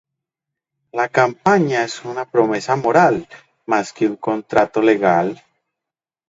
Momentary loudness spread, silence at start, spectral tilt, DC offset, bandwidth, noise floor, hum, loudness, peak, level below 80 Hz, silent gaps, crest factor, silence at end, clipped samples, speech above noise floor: 11 LU; 0.95 s; -6 dB/octave; under 0.1%; 7.8 kHz; -86 dBFS; none; -17 LUFS; 0 dBFS; -60 dBFS; none; 18 dB; 0.95 s; under 0.1%; 69 dB